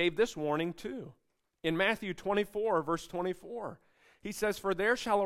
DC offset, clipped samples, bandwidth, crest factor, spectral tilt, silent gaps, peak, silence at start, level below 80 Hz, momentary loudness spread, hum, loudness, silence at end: under 0.1%; under 0.1%; 16 kHz; 18 dB; -4.5 dB/octave; none; -16 dBFS; 0 s; -62 dBFS; 13 LU; none; -33 LUFS; 0 s